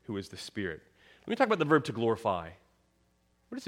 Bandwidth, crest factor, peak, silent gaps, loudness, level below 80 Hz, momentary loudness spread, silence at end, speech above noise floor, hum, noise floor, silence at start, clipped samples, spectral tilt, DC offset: 14.5 kHz; 22 dB; -10 dBFS; none; -31 LUFS; -66 dBFS; 20 LU; 0 s; 40 dB; none; -71 dBFS; 0.1 s; under 0.1%; -6 dB/octave; under 0.1%